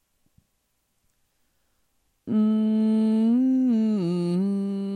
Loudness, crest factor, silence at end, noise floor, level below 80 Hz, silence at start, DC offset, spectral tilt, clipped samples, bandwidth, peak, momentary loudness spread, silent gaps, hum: -23 LUFS; 10 dB; 0 s; -73 dBFS; -76 dBFS; 2.25 s; under 0.1%; -9 dB/octave; under 0.1%; 9.6 kHz; -14 dBFS; 5 LU; none; none